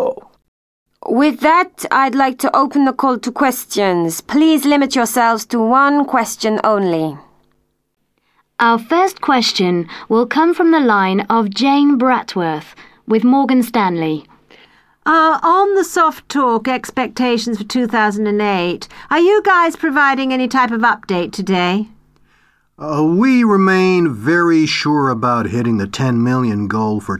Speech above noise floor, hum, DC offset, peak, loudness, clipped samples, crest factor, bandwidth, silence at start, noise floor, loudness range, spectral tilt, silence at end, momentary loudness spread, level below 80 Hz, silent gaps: 48 dB; none; under 0.1%; 0 dBFS; -14 LUFS; under 0.1%; 14 dB; 16 kHz; 0 s; -62 dBFS; 3 LU; -5 dB/octave; 0 s; 8 LU; -54 dBFS; 0.48-0.86 s